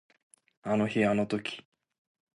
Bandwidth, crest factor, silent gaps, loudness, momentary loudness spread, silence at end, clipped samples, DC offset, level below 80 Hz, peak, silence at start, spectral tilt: 11.5 kHz; 18 dB; none; -29 LUFS; 15 LU; 0.75 s; under 0.1%; under 0.1%; -66 dBFS; -14 dBFS; 0.65 s; -6.5 dB/octave